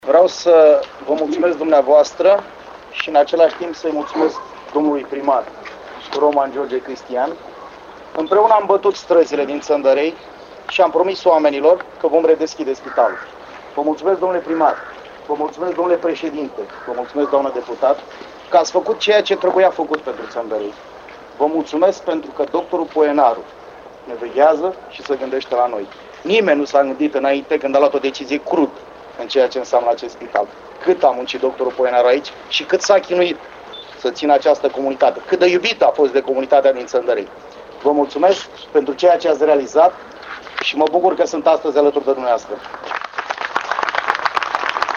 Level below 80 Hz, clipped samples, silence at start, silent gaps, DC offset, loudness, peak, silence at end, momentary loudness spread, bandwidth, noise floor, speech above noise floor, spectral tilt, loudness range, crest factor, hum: -58 dBFS; under 0.1%; 0.05 s; none; under 0.1%; -17 LUFS; 0 dBFS; 0 s; 16 LU; 7.4 kHz; -37 dBFS; 21 dB; -4 dB/octave; 4 LU; 16 dB; none